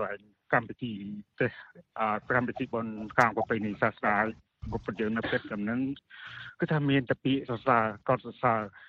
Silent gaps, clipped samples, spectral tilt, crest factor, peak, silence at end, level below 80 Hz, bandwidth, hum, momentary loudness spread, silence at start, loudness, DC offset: none; under 0.1%; -7.5 dB/octave; 26 dB; -4 dBFS; 0.05 s; -58 dBFS; 8.2 kHz; none; 15 LU; 0 s; -30 LUFS; under 0.1%